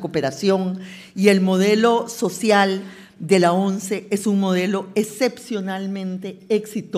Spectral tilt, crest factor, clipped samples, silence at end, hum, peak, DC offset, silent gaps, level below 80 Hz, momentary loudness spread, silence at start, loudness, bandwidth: -5.5 dB/octave; 20 dB; under 0.1%; 0 s; none; 0 dBFS; under 0.1%; none; -68 dBFS; 12 LU; 0 s; -20 LUFS; 15.5 kHz